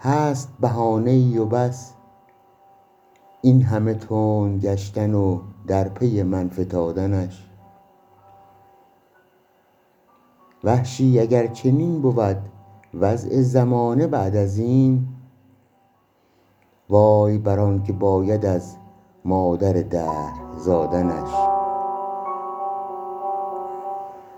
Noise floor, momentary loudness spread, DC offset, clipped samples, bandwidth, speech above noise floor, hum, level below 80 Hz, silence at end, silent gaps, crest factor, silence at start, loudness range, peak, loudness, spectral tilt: -61 dBFS; 12 LU; under 0.1%; under 0.1%; 8.2 kHz; 42 dB; none; -52 dBFS; 0 s; none; 20 dB; 0 s; 6 LU; -2 dBFS; -21 LUFS; -9 dB/octave